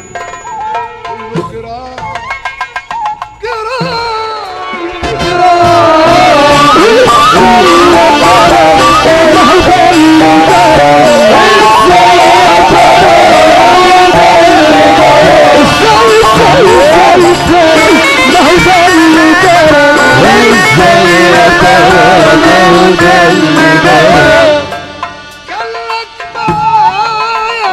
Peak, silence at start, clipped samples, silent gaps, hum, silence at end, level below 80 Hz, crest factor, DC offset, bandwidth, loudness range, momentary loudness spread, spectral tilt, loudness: 0 dBFS; 0.15 s; 0.4%; none; none; 0 s; -30 dBFS; 4 dB; under 0.1%; 15.5 kHz; 11 LU; 14 LU; -4 dB/octave; -4 LUFS